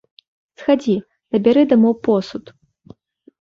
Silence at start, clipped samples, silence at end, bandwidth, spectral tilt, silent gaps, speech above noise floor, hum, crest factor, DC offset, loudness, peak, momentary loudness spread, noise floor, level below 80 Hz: 0.6 s; under 0.1%; 1 s; 7.2 kHz; -7.5 dB/octave; none; 31 dB; none; 16 dB; under 0.1%; -17 LUFS; -2 dBFS; 12 LU; -47 dBFS; -60 dBFS